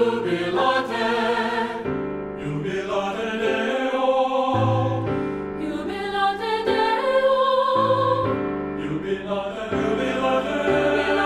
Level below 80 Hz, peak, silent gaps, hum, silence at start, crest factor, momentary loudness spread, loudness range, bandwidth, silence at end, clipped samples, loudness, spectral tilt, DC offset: -50 dBFS; -6 dBFS; none; none; 0 s; 16 dB; 8 LU; 3 LU; 12 kHz; 0 s; under 0.1%; -23 LUFS; -6 dB/octave; under 0.1%